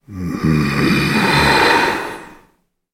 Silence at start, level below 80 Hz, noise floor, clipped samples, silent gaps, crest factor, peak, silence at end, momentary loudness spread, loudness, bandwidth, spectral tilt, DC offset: 0.1 s; -36 dBFS; -58 dBFS; under 0.1%; none; 16 dB; -2 dBFS; 0.6 s; 14 LU; -14 LUFS; 16.5 kHz; -5 dB/octave; under 0.1%